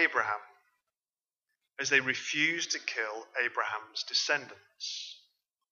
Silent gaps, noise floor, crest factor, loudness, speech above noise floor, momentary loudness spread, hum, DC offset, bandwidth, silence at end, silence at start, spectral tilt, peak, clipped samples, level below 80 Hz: none; under -90 dBFS; 24 dB; -31 LUFS; over 57 dB; 13 LU; none; under 0.1%; 7.6 kHz; 0.55 s; 0 s; -1 dB/octave; -10 dBFS; under 0.1%; under -90 dBFS